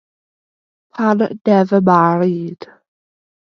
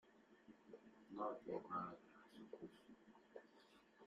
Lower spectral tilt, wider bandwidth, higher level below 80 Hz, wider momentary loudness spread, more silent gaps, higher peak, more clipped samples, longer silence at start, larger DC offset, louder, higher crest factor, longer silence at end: first, -9 dB/octave vs -7 dB/octave; second, 6.6 kHz vs 11.5 kHz; first, -64 dBFS vs -88 dBFS; about the same, 17 LU vs 19 LU; neither; first, 0 dBFS vs -34 dBFS; neither; first, 0.95 s vs 0.05 s; neither; first, -15 LUFS vs -53 LUFS; about the same, 16 dB vs 20 dB; first, 0.75 s vs 0 s